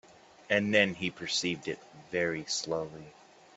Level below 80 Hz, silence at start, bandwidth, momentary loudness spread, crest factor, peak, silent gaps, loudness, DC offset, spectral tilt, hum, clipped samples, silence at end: -70 dBFS; 0.5 s; 8.4 kHz; 15 LU; 24 dB; -8 dBFS; none; -31 LUFS; under 0.1%; -3.5 dB/octave; none; under 0.1%; 0.45 s